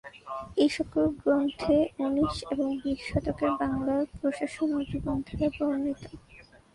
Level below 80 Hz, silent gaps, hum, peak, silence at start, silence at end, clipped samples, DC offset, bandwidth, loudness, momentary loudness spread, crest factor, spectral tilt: -48 dBFS; none; none; -12 dBFS; 0.05 s; 0.35 s; under 0.1%; under 0.1%; 11.5 kHz; -29 LUFS; 7 LU; 16 dB; -6.5 dB/octave